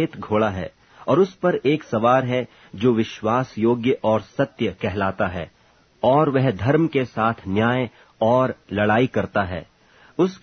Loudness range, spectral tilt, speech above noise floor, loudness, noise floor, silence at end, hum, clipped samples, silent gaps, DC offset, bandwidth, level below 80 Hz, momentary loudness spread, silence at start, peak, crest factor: 2 LU; -7.5 dB/octave; 28 dB; -21 LUFS; -48 dBFS; 0.05 s; none; under 0.1%; none; under 0.1%; 6.6 kHz; -52 dBFS; 9 LU; 0 s; -4 dBFS; 18 dB